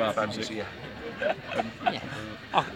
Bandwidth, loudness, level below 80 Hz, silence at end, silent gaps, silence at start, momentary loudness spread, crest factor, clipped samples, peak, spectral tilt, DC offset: 17 kHz; -32 LUFS; -58 dBFS; 0 s; none; 0 s; 9 LU; 22 dB; under 0.1%; -8 dBFS; -4.5 dB/octave; under 0.1%